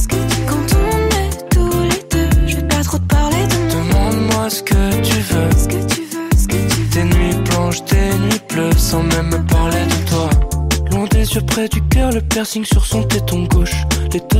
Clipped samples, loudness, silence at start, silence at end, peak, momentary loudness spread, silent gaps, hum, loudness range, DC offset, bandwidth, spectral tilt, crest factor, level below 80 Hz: under 0.1%; -15 LUFS; 0 s; 0 s; -2 dBFS; 3 LU; none; none; 1 LU; under 0.1%; 16.5 kHz; -5 dB/octave; 12 dB; -18 dBFS